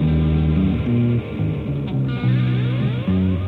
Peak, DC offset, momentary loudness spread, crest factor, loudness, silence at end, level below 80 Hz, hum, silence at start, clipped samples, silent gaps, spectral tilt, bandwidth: -8 dBFS; under 0.1%; 5 LU; 12 dB; -20 LUFS; 0 s; -30 dBFS; none; 0 s; under 0.1%; none; -10.5 dB/octave; 4.4 kHz